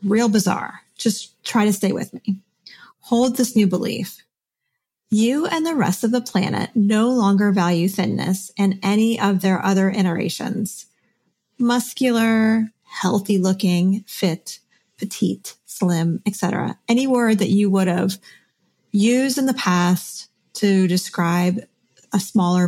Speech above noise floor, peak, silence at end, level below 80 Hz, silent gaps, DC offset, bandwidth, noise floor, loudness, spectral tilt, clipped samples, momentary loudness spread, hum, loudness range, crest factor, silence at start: 60 dB; -4 dBFS; 0 s; -68 dBFS; none; under 0.1%; 16 kHz; -79 dBFS; -20 LUFS; -5.5 dB/octave; under 0.1%; 10 LU; none; 3 LU; 16 dB; 0 s